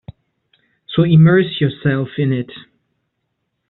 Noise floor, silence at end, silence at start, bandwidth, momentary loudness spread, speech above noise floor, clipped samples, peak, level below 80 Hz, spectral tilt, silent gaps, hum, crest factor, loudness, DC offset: -72 dBFS; 1.1 s; 0.9 s; 4.1 kHz; 12 LU; 58 dB; under 0.1%; -2 dBFS; -52 dBFS; -7 dB/octave; none; none; 14 dB; -15 LUFS; under 0.1%